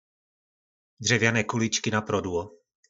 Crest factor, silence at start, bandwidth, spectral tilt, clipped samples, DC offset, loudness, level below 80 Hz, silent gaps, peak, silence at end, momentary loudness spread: 22 dB; 1 s; 8 kHz; -4 dB/octave; under 0.1%; under 0.1%; -25 LUFS; -64 dBFS; none; -8 dBFS; 0.4 s; 10 LU